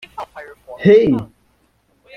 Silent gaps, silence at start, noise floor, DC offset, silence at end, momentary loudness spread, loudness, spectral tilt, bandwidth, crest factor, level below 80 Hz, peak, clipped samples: none; 0.2 s; -60 dBFS; under 0.1%; 0.9 s; 25 LU; -14 LUFS; -8.5 dB/octave; 6.2 kHz; 16 dB; -50 dBFS; -2 dBFS; under 0.1%